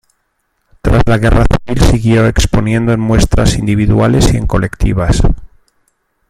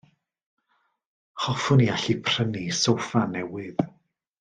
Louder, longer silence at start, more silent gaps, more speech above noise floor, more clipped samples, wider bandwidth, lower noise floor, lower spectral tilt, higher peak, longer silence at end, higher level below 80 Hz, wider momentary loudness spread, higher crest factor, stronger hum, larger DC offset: first, -12 LUFS vs -25 LUFS; second, 0.85 s vs 1.35 s; neither; first, 54 dB vs 48 dB; neither; first, 15 kHz vs 9.6 kHz; second, -64 dBFS vs -72 dBFS; about the same, -6 dB/octave vs -5 dB/octave; first, 0 dBFS vs -8 dBFS; first, 0.85 s vs 0.5 s; first, -18 dBFS vs -62 dBFS; second, 5 LU vs 11 LU; second, 10 dB vs 18 dB; neither; neither